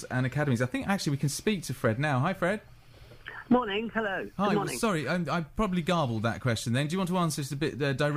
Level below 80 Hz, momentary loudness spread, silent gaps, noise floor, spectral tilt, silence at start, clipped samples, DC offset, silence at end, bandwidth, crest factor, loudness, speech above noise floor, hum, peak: -52 dBFS; 4 LU; none; -51 dBFS; -5.5 dB/octave; 0 s; under 0.1%; under 0.1%; 0 s; 15.5 kHz; 16 dB; -29 LUFS; 23 dB; none; -14 dBFS